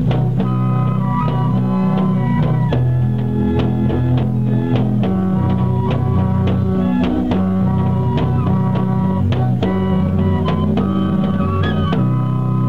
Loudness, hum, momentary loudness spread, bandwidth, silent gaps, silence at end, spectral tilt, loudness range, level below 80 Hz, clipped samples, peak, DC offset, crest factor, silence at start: -17 LUFS; none; 1 LU; 4.7 kHz; none; 0 s; -10 dB/octave; 0 LU; -36 dBFS; under 0.1%; -4 dBFS; 2%; 12 dB; 0 s